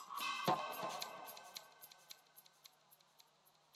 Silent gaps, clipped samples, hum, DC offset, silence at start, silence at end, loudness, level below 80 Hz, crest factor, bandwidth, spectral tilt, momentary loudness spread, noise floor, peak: none; under 0.1%; none; under 0.1%; 0 s; 0.8 s; -43 LUFS; under -90 dBFS; 24 dB; 17 kHz; -3 dB/octave; 24 LU; -73 dBFS; -24 dBFS